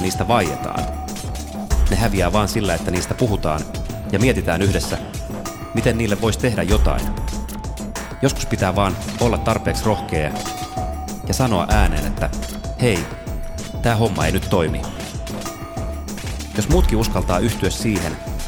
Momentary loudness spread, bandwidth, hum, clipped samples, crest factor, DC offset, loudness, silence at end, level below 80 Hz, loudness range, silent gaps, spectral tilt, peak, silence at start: 11 LU; over 20 kHz; none; under 0.1%; 18 dB; 0.2%; -21 LUFS; 0 s; -26 dBFS; 2 LU; none; -5.5 dB/octave; -2 dBFS; 0 s